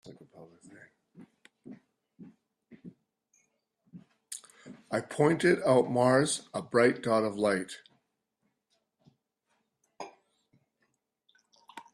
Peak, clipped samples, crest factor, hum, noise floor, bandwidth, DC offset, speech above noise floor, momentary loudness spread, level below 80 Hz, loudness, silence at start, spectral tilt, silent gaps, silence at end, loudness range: -10 dBFS; under 0.1%; 22 dB; none; -80 dBFS; 14.5 kHz; under 0.1%; 52 dB; 23 LU; -74 dBFS; -27 LUFS; 0.05 s; -5 dB/octave; none; 0.15 s; 22 LU